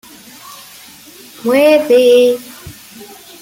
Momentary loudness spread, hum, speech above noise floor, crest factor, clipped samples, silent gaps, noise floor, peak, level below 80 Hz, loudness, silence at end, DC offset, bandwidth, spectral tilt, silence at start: 25 LU; none; 29 dB; 14 dB; under 0.1%; none; -38 dBFS; 0 dBFS; -56 dBFS; -11 LUFS; 0.35 s; under 0.1%; 17 kHz; -3.5 dB/octave; 0.45 s